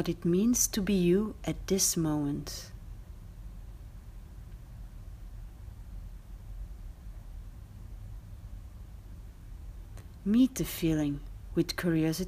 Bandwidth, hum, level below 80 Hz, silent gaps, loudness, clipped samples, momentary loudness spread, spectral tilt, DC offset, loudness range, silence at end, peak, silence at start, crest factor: 15.5 kHz; none; -46 dBFS; none; -29 LUFS; under 0.1%; 23 LU; -4.5 dB/octave; under 0.1%; 19 LU; 0 s; -14 dBFS; 0 s; 18 dB